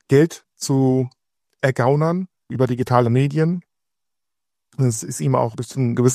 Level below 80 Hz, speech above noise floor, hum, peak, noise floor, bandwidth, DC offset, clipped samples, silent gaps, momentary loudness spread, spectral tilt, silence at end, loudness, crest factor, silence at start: -58 dBFS; 67 dB; none; 0 dBFS; -85 dBFS; 15 kHz; under 0.1%; under 0.1%; none; 10 LU; -6.5 dB/octave; 0 s; -20 LUFS; 20 dB; 0.1 s